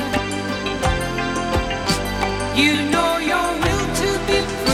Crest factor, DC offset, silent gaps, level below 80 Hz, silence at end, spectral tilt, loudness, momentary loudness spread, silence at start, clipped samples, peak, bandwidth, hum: 18 dB; under 0.1%; none; -32 dBFS; 0 s; -4 dB/octave; -20 LUFS; 6 LU; 0 s; under 0.1%; -2 dBFS; 17 kHz; none